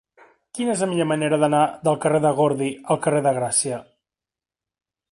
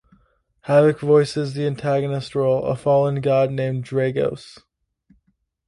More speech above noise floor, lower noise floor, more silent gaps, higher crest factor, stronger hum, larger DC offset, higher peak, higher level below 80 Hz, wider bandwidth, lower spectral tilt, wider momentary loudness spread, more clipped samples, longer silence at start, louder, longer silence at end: first, 69 dB vs 49 dB; first, -90 dBFS vs -68 dBFS; neither; about the same, 18 dB vs 18 dB; neither; neither; about the same, -6 dBFS vs -4 dBFS; second, -66 dBFS vs -56 dBFS; about the same, 11.5 kHz vs 11.5 kHz; second, -5 dB/octave vs -7.5 dB/octave; about the same, 8 LU vs 8 LU; neither; about the same, 0.55 s vs 0.65 s; about the same, -21 LUFS vs -20 LUFS; about the same, 1.3 s vs 1.2 s